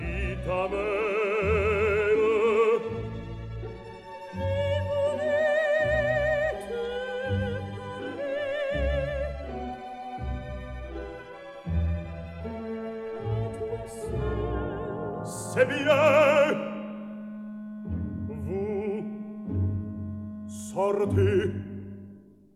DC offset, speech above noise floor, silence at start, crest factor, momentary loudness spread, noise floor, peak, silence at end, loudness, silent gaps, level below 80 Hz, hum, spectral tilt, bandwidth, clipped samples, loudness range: under 0.1%; 27 dB; 0 s; 20 dB; 15 LU; -50 dBFS; -8 dBFS; 0.35 s; -28 LUFS; none; -42 dBFS; none; -6.5 dB/octave; 13.5 kHz; under 0.1%; 9 LU